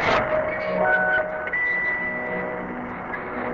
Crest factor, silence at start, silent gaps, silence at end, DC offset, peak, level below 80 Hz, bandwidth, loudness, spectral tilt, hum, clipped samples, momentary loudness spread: 18 dB; 0 s; none; 0 s; under 0.1%; -8 dBFS; -50 dBFS; 7.6 kHz; -23 LUFS; -6 dB/octave; none; under 0.1%; 11 LU